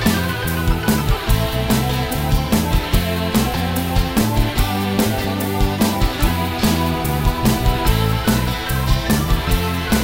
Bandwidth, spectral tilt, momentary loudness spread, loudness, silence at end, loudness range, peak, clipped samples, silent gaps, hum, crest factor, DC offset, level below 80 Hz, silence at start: 16.5 kHz; -5 dB/octave; 2 LU; -19 LUFS; 0 s; 1 LU; -2 dBFS; under 0.1%; none; none; 14 dB; under 0.1%; -22 dBFS; 0 s